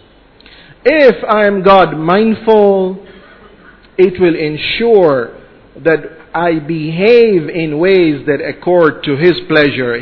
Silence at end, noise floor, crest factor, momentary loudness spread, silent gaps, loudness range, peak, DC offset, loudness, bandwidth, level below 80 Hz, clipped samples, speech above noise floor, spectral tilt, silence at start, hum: 0 s; -42 dBFS; 12 dB; 9 LU; none; 3 LU; 0 dBFS; under 0.1%; -11 LUFS; 5.4 kHz; -44 dBFS; 0.8%; 32 dB; -8.5 dB/octave; 0.85 s; none